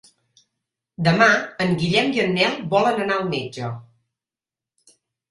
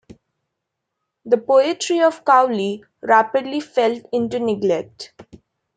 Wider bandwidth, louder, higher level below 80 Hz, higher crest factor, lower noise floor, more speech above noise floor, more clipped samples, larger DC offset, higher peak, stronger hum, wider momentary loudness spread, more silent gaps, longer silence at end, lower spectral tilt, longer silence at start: first, 11.5 kHz vs 9.4 kHz; about the same, -20 LUFS vs -18 LUFS; first, -58 dBFS vs -64 dBFS; about the same, 20 dB vs 18 dB; first, under -90 dBFS vs -79 dBFS; first, over 70 dB vs 61 dB; neither; neither; about the same, -2 dBFS vs -2 dBFS; neither; first, 14 LU vs 11 LU; neither; first, 1.5 s vs 0.55 s; about the same, -5.5 dB/octave vs -4.5 dB/octave; second, 1 s vs 1.25 s